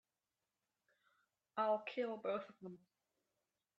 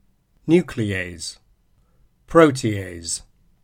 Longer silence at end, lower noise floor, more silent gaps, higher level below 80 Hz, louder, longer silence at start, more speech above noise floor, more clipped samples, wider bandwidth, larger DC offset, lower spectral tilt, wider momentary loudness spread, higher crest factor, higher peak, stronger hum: first, 1 s vs 0.45 s; first, under -90 dBFS vs -59 dBFS; neither; second, under -90 dBFS vs -48 dBFS; second, -42 LUFS vs -20 LUFS; first, 1.55 s vs 0.45 s; first, over 48 dB vs 40 dB; neither; second, 7.4 kHz vs 15.5 kHz; neither; about the same, -6.5 dB/octave vs -5.5 dB/octave; about the same, 18 LU vs 17 LU; about the same, 22 dB vs 22 dB; second, -26 dBFS vs 0 dBFS; neither